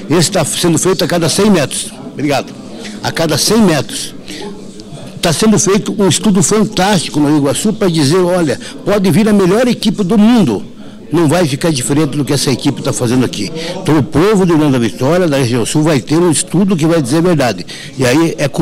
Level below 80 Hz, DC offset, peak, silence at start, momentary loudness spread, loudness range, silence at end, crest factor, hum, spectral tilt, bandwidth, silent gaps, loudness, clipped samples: -38 dBFS; under 0.1%; 0 dBFS; 0 s; 11 LU; 3 LU; 0 s; 12 dB; none; -5 dB/octave; 16.5 kHz; none; -12 LUFS; under 0.1%